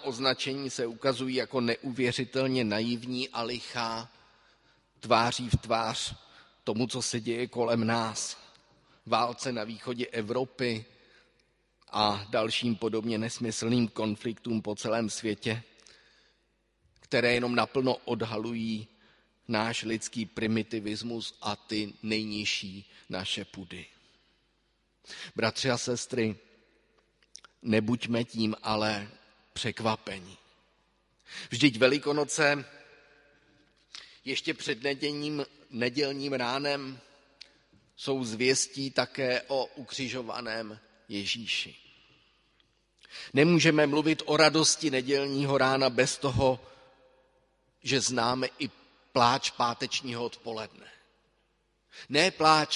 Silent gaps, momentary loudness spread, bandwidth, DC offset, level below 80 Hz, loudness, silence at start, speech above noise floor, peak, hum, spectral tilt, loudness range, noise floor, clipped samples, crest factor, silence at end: none; 14 LU; 11.5 kHz; under 0.1%; -60 dBFS; -29 LUFS; 0 s; 43 dB; -6 dBFS; none; -4 dB/octave; 8 LU; -73 dBFS; under 0.1%; 26 dB; 0 s